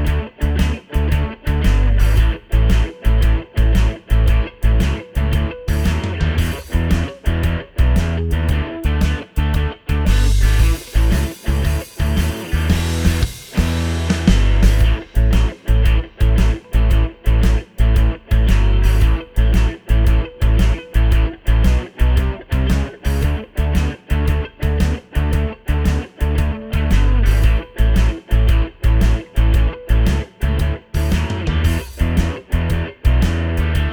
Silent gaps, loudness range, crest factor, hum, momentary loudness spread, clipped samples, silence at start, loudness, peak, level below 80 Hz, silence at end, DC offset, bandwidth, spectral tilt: none; 2 LU; 14 dB; none; 5 LU; under 0.1%; 0 s; -18 LUFS; 0 dBFS; -16 dBFS; 0 s; under 0.1%; 17 kHz; -6.5 dB/octave